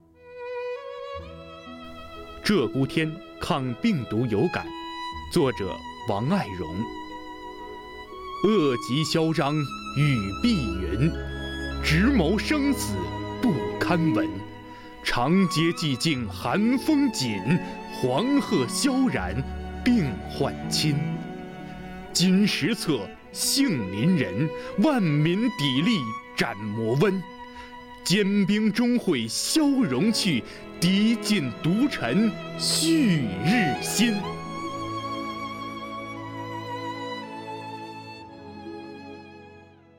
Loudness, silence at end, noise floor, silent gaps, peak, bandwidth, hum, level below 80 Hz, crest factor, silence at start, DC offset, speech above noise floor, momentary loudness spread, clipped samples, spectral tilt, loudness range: -25 LUFS; 0.35 s; -50 dBFS; none; -6 dBFS; 17 kHz; none; -44 dBFS; 18 dB; 0.25 s; under 0.1%; 26 dB; 17 LU; under 0.1%; -5 dB/octave; 6 LU